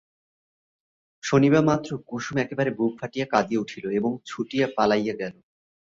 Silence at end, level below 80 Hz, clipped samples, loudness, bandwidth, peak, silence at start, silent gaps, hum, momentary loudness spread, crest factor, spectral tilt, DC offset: 0.55 s; -62 dBFS; under 0.1%; -24 LUFS; 7.8 kHz; -6 dBFS; 1.25 s; none; none; 13 LU; 20 dB; -6 dB/octave; under 0.1%